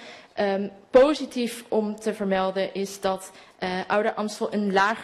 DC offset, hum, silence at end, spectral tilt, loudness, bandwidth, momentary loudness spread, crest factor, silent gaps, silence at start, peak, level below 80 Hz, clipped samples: under 0.1%; none; 0 s; -5 dB/octave; -25 LUFS; 13 kHz; 10 LU; 20 dB; none; 0 s; -4 dBFS; -58 dBFS; under 0.1%